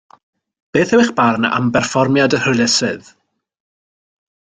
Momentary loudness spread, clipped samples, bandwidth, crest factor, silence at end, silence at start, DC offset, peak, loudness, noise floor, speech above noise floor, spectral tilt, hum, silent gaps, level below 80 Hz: 6 LU; under 0.1%; 9.6 kHz; 16 dB; 1.55 s; 0.75 s; under 0.1%; -2 dBFS; -15 LUFS; under -90 dBFS; over 76 dB; -4.5 dB/octave; none; none; -54 dBFS